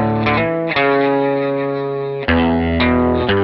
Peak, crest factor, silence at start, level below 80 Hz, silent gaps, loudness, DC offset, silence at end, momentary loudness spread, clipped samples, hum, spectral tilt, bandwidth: -4 dBFS; 12 dB; 0 s; -34 dBFS; none; -16 LUFS; under 0.1%; 0 s; 6 LU; under 0.1%; none; -9.5 dB/octave; 5.8 kHz